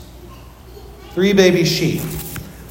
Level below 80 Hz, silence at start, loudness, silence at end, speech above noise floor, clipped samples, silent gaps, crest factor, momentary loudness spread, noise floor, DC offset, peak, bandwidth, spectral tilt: -40 dBFS; 0 s; -16 LUFS; 0 s; 23 dB; under 0.1%; none; 18 dB; 18 LU; -38 dBFS; under 0.1%; 0 dBFS; 17 kHz; -5 dB/octave